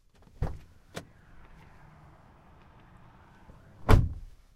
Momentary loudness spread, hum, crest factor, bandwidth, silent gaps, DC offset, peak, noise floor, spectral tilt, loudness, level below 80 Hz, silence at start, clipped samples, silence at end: 22 LU; none; 26 dB; 15 kHz; none; under 0.1%; -6 dBFS; -56 dBFS; -7 dB/octave; -29 LUFS; -36 dBFS; 0.4 s; under 0.1%; 0.3 s